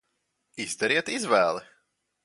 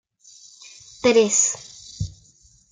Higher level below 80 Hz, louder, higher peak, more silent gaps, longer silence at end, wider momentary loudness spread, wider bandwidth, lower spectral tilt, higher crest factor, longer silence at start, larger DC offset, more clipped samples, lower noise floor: second, -74 dBFS vs -50 dBFS; second, -26 LUFS vs -18 LUFS; about the same, -8 dBFS vs -6 dBFS; neither; about the same, 0.6 s vs 0.6 s; second, 13 LU vs 26 LU; first, 11.5 kHz vs 9.8 kHz; about the same, -2.5 dB/octave vs -2.5 dB/octave; about the same, 20 dB vs 18 dB; second, 0.55 s vs 1.05 s; neither; neither; first, -77 dBFS vs -55 dBFS